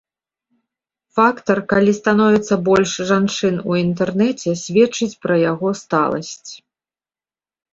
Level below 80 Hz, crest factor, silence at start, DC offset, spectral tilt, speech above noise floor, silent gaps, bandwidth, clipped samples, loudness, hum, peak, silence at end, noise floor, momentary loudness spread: -56 dBFS; 16 dB; 1.15 s; under 0.1%; -5.5 dB/octave; over 73 dB; none; 7.8 kHz; under 0.1%; -17 LUFS; none; -2 dBFS; 1.2 s; under -90 dBFS; 7 LU